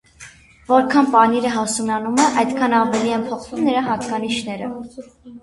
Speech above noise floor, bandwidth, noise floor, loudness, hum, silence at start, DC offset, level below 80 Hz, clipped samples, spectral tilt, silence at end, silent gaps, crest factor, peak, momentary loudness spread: 25 dB; 11.5 kHz; -44 dBFS; -18 LUFS; none; 0.2 s; under 0.1%; -56 dBFS; under 0.1%; -4 dB/octave; 0.05 s; none; 18 dB; 0 dBFS; 13 LU